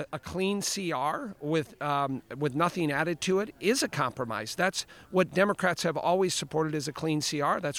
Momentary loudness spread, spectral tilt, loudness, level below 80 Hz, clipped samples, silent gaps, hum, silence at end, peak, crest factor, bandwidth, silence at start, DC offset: 6 LU; -4 dB/octave; -29 LUFS; -62 dBFS; under 0.1%; none; none; 0 s; -12 dBFS; 18 dB; 17 kHz; 0 s; under 0.1%